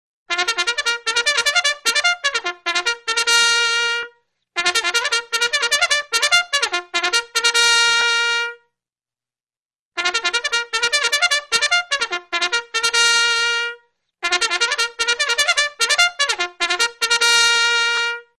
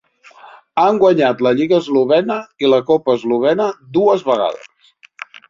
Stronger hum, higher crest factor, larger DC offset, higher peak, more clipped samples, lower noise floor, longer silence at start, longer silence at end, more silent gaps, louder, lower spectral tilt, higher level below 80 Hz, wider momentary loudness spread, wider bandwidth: neither; first, 20 dB vs 14 dB; neither; about the same, 0 dBFS vs -2 dBFS; neither; first, under -90 dBFS vs -50 dBFS; second, 0.3 s vs 0.45 s; second, 0.2 s vs 0.85 s; first, 9.59-9.69 s, 9.79-9.91 s vs none; about the same, -17 LUFS vs -15 LUFS; second, 2.5 dB/octave vs -6.5 dB/octave; about the same, -62 dBFS vs -60 dBFS; about the same, 8 LU vs 10 LU; first, 12 kHz vs 7.4 kHz